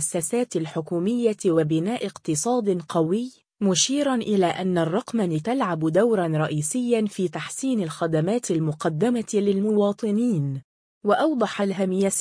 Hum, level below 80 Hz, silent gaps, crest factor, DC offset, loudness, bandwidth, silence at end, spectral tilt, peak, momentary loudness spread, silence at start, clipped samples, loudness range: none; -66 dBFS; 10.64-11.01 s; 16 dB; under 0.1%; -23 LUFS; 10.5 kHz; 0 s; -5 dB/octave; -6 dBFS; 6 LU; 0 s; under 0.1%; 1 LU